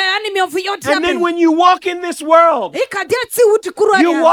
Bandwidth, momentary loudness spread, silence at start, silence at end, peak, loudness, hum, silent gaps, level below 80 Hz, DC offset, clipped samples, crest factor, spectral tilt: 18 kHz; 9 LU; 0 s; 0 s; 0 dBFS; -13 LUFS; none; none; -56 dBFS; under 0.1%; under 0.1%; 14 dB; -3 dB/octave